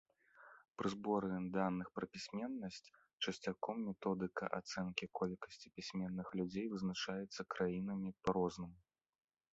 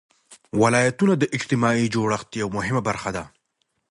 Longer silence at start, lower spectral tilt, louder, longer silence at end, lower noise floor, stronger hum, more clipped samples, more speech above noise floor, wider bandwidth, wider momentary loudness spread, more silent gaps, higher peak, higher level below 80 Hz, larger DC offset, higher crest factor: about the same, 0.35 s vs 0.3 s; about the same, -5 dB/octave vs -5.5 dB/octave; second, -43 LUFS vs -22 LUFS; about the same, 0.75 s vs 0.65 s; second, -65 dBFS vs -73 dBFS; neither; neither; second, 22 dB vs 52 dB; second, 8 kHz vs 11.5 kHz; about the same, 11 LU vs 9 LU; first, 3.13-3.18 s vs none; second, -20 dBFS vs -4 dBFS; second, -72 dBFS vs -54 dBFS; neither; about the same, 22 dB vs 18 dB